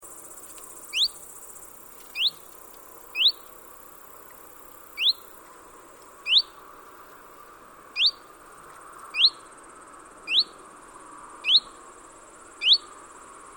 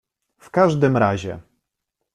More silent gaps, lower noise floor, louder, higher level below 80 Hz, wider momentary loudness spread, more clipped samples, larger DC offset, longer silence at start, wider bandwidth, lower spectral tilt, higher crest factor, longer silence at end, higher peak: neither; second, -48 dBFS vs -80 dBFS; second, -22 LUFS vs -19 LUFS; second, -66 dBFS vs -56 dBFS; first, 26 LU vs 16 LU; neither; neither; second, 0.05 s vs 0.55 s; first, over 20 kHz vs 11 kHz; second, 1.5 dB/octave vs -7.5 dB/octave; about the same, 22 dB vs 18 dB; about the same, 0.7 s vs 0.75 s; second, -8 dBFS vs -4 dBFS